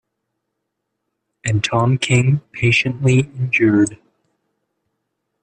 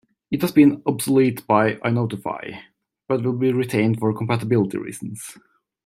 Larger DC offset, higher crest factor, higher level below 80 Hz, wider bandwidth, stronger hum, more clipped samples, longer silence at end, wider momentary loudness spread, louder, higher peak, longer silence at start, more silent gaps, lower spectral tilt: neither; about the same, 16 dB vs 18 dB; first, -52 dBFS vs -62 dBFS; second, 10 kHz vs 16 kHz; neither; neither; first, 1.45 s vs 0.5 s; second, 5 LU vs 16 LU; first, -17 LUFS vs -20 LUFS; about the same, -4 dBFS vs -2 dBFS; first, 1.45 s vs 0.3 s; neither; about the same, -5.5 dB/octave vs -6.5 dB/octave